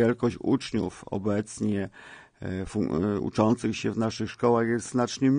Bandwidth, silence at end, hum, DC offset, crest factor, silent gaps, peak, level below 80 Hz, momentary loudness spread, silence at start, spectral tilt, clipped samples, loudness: 10 kHz; 0 s; none; under 0.1%; 18 dB; none; -10 dBFS; -56 dBFS; 10 LU; 0 s; -6.5 dB/octave; under 0.1%; -28 LUFS